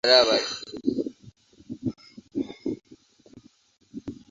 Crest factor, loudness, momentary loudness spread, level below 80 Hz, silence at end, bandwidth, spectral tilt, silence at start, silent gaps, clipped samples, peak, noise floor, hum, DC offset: 24 dB; -26 LUFS; 21 LU; -62 dBFS; 0.15 s; 7.8 kHz; -3.5 dB/octave; 0.05 s; none; under 0.1%; -4 dBFS; -55 dBFS; none; under 0.1%